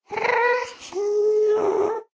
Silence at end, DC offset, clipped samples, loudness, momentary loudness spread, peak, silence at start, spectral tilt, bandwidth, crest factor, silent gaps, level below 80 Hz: 0.1 s; under 0.1%; under 0.1%; -22 LUFS; 7 LU; -8 dBFS; 0.1 s; -3.5 dB/octave; 8 kHz; 14 dB; none; -68 dBFS